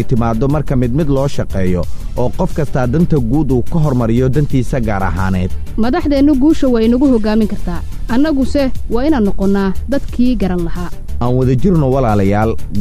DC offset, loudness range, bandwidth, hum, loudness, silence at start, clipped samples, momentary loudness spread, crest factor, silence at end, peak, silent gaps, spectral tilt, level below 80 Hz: under 0.1%; 2 LU; 15 kHz; none; -15 LUFS; 0 s; under 0.1%; 8 LU; 10 dB; 0 s; -2 dBFS; none; -8 dB/octave; -22 dBFS